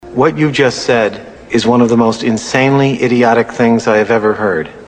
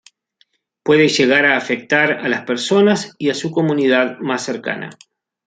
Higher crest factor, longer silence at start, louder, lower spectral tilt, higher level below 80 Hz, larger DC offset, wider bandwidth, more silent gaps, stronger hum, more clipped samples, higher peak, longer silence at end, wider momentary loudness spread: about the same, 12 dB vs 16 dB; second, 0.05 s vs 0.85 s; first, -12 LUFS vs -16 LUFS; about the same, -5.5 dB/octave vs -4.5 dB/octave; first, -46 dBFS vs -64 dBFS; neither; about the same, 9.4 kHz vs 9.4 kHz; neither; neither; neither; about the same, 0 dBFS vs 0 dBFS; second, 0 s vs 0.55 s; second, 6 LU vs 11 LU